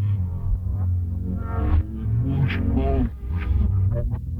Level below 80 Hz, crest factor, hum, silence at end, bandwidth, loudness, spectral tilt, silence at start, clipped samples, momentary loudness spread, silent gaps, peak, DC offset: -26 dBFS; 12 dB; none; 0 s; 4.2 kHz; -24 LUFS; -10 dB/octave; 0 s; under 0.1%; 5 LU; none; -10 dBFS; under 0.1%